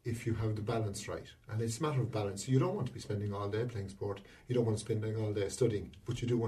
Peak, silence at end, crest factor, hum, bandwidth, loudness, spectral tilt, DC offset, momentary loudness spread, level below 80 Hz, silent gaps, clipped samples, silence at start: -16 dBFS; 0 s; 18 dB; none; 13.5 kHz; -36 LUFS; -6.5 dB/octave; under 0.1%; 9 LU; -60 dBFS; none; under 0.1%; 0.05 s